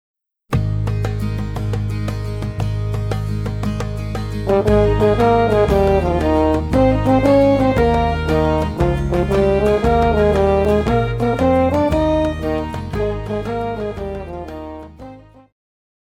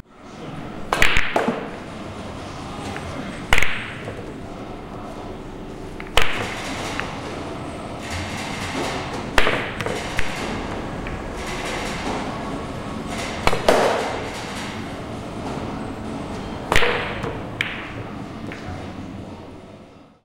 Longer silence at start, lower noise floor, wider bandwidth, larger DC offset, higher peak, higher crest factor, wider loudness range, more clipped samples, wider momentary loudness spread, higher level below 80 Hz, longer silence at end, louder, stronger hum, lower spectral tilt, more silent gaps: first, 0.5 s vs 0 s; second, -39 dBFS vs -45 dBFS; about the same, 15.5 kHz vs 16.5 kHz; neither; about the same, -2 dBFS vs -2 dBFS; second, 14 dB vs 22 dB; first, 8 LU vs 4 LU; neither; second, 10 LU vs 15 LU; first, -26 dBFS vs -36 dBFS; first, 0.85 s vs 0 s; first, -17 LUFS vs -25 LUFS; neither; first, -8 dB/octave vs -4 dB/octave; neither